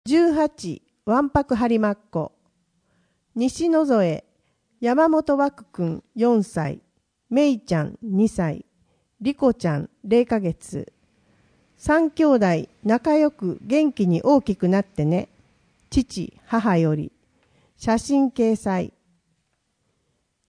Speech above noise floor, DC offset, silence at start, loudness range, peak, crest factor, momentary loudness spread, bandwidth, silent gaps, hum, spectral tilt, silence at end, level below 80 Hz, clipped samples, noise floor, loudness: 51 dB; under 0.1%; 0.05 s; 4 LU; -6 dBFS; 16 dB; 13 LU; 10.5 kHz; none; none; -7 dB/octave; 1.65 s; -48 dBFS; under 0.1%; -72 dBFS; -22 LUFS